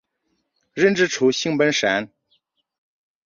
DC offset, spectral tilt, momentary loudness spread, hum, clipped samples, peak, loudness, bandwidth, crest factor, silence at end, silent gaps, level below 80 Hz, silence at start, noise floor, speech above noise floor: under 0.1%; -4 dB/octave; 12 LU; none; under 0.1%; -4 dBFS; -19 LUFS; 7.4 kHz; 18 dB; 1.2 s; none; -64 dBFS; 0.75 s; -72 dBFS; 54 dB